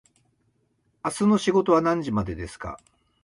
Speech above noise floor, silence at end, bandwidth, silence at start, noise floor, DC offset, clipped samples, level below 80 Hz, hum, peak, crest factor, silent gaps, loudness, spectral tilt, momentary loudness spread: 46 dB; 0.45 s; 11.5 kHz; 1.05 s; -69 dBFS; under 0.1%; under 0.1%; -48 dBFS; none; -8 dBFS; 18 dB; none; -23 LUFS; -6 dB/octave; 17 LU